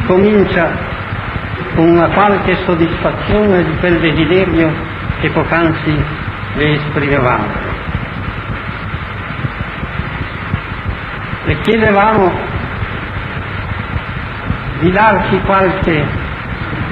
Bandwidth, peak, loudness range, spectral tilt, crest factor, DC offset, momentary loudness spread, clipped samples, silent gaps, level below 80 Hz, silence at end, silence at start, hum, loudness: 5.6 kHz; 0 dBFS; 7 LU; -9 dB/octave; 14 dB; under 0.1%; 11 LU; under 0.1%; none; -28 dBFS; 0 s; 0 s; none; -14 LUFS